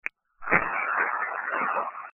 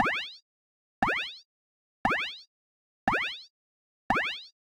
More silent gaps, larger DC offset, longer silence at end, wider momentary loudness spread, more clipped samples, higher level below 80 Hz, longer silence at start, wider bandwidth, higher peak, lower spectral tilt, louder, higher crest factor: second, none vs 0.42-1.02 s, 1.45-2.04 s, 2.47-3.07 s, 3.50-4.10 s; neither; about the same, 0.05 s vs 0.1 s; second, 9 LU vs 14 LU; neither; about the same, -60 dBFS vs -56 dBFS; first, 0.4 s vs 0 s; second, 7 kHz vs 16 kHz; first, -4 dBFS vs -10 dBFS; first, -7 dB/octave vs -4 dB/octave; first, -26 LUFS vs -30 LUFS; about the same, 24 dB vs 22 dB